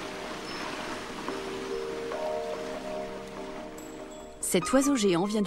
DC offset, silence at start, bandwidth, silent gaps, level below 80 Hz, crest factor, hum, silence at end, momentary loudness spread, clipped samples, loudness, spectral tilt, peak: under 0.1%; 0 s; 16 kHz; none; -54 dBFS; 20 dB; none; 0 s; 16 LU; under 0.1%; -31 LUFS; -4 dB/octave; -12 dBFS